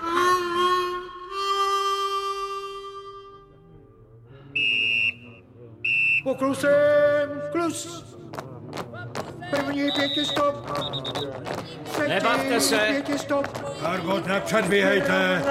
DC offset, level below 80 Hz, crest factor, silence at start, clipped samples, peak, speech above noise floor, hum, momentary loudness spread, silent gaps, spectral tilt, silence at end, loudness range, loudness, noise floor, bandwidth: under 0.1%; -58 dBFS; 18 dB; 0 s; under 0.1%; -6 dBFS; 26 dB; none; 16 LU; none; -3.5 dB/octave; 0 s; 6 LU; -23 LUFS; -50 dBFS; 16 kHz